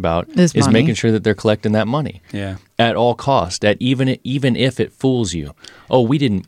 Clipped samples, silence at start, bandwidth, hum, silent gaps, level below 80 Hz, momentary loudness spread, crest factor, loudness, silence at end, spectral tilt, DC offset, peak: under 0.1%; 0 s; 12.5 kHz; none; none; -44 dBFS; 12 LU; 16 dB; -17 LUFS; 0.05 s; -6 dB/octave; under 0.1%; 0 dBFS